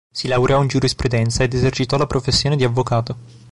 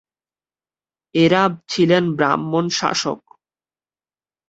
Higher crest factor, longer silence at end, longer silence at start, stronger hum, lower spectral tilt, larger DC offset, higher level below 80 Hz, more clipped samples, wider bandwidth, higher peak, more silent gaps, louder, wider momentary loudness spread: second, 12 dB vs 18 dB; second, 0 s vs 1.3 s; second, 0.15 s vs 1.15 s; neither; about the same, -5.5 dB/octave vs -5 dB/octave; first, 0.7% vs under 0.1%; first, -36 dBFS vs -62 dBFS; neither; first, 11.5 kHz vs 8 kHz; second, -6 dBFS vs -2 dBFS; neither; about the same, -18 LUFS vs -18 LUFS; second, 5 LU vs 9 LU